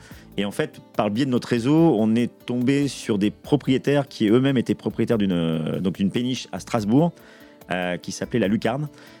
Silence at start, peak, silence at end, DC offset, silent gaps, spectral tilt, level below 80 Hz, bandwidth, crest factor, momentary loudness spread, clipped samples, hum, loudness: 0.05 s; -2 dBFS; 0.15 s; under 0.1%; none; -6.5 dB/octave; -54 dBFS; 17.5 kHz; 20 dB; 9 LU; under 0.1%; none; -23 LUFS